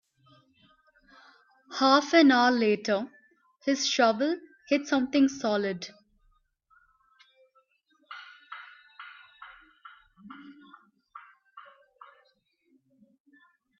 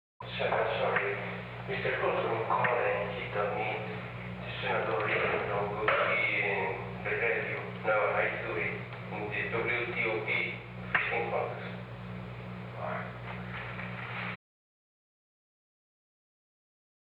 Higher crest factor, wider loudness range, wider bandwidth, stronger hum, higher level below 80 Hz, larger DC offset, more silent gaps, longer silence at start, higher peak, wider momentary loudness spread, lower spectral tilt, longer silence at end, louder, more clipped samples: about the same, 22 dB vs 22 dB; first, 24 LU vs 11 LU; first, 7.2 kHz vs 5.4 kHz; second, none vs 60 Hz at -45 dBFS; second, -74 dBFS vs -58 dBFS; neither; neither; first, 1.7 s vs 0.2 s; first, -8 dBFS vs -12 dBFS; first, 28 LU vs 12 LU; second, -3.5 dB/octave vs -7.5 dB/octave; second, 2.2 s vs 2.75 s; first, -25 LUFS vs -32 LUFS; neither